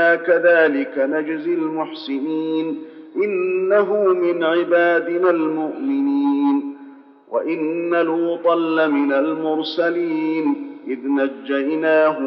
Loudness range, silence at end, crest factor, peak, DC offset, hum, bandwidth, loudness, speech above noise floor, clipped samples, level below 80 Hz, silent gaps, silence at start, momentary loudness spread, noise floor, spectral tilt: 3 LU; 0 s; 16 dB; -4 dBFS; under 0.1%; none; 5.8 kHz; -19 LUFS; 24 dB; under 0.1%; -90 dBFS; none; 0 s; 9 LU; -42 dBFS; -3 dB/octave